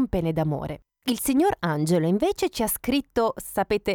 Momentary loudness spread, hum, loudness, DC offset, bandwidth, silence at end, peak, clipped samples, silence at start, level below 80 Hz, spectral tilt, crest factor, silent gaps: 7 LU; none; -25 LUFS; under 0.1%; 19.5 kHz; 0 s; -10 dBFS; under 0.1%; 0 s; -44 dBFS; -5.5 dB/octave; 14 dB; none